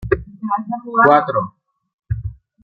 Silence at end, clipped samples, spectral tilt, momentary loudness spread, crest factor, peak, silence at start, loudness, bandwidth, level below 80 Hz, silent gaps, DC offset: 0.3 s; under 0.1%; -9.5 dB/octave; 16 LU; 18 dB; -2 dBFS; 0 s; -18 LUFS; 5.2 kHz; -38 dBFS; 1.93-1.98 s; under 0.1%